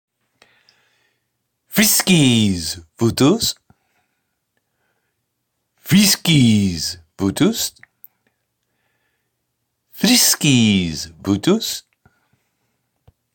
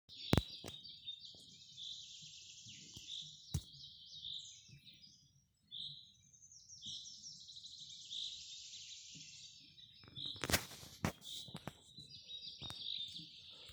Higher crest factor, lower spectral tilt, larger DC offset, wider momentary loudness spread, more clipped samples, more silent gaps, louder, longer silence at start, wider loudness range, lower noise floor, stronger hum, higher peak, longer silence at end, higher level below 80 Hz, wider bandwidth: second, 16 dB vs 38 dB; about the same, -4 dB/octave vs -3.5 dB/octave; neither; second, 12 LU vs 19 LU; neither; neither; first, -16 LUFS vs -46 LUFS; first, 1.7 s vs 0.1 s; about the same, 5 LU vs 7 LU; about the same, -74 dBFS vs -72 dBFS; neither; first, -2 dBFS vs -10 dBFS; first, 1.55 s vs 0 s; first, -50 dBFS vs -62 dBFS; second, 17 kHz vs over 20 kHz